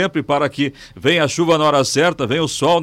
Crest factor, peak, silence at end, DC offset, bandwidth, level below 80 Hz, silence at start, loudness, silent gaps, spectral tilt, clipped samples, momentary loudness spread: 12 dB; -6 dBFS; 0 s; under 0.1%; 16 kHz; -52 dBFS; 0 s; -17 LUFS; none; -4.5 dB/octave; under 0.1%; 6 LU